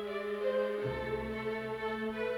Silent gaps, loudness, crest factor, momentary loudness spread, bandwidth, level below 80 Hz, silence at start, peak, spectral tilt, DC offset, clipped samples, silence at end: none; -36 LUFS; 14 dB; 4 LU; 17 kHz; -56 dBFS; 0 s; -22 dBFS; -6.5 dB/octave; under 0.1%; under 0.1%; 0 s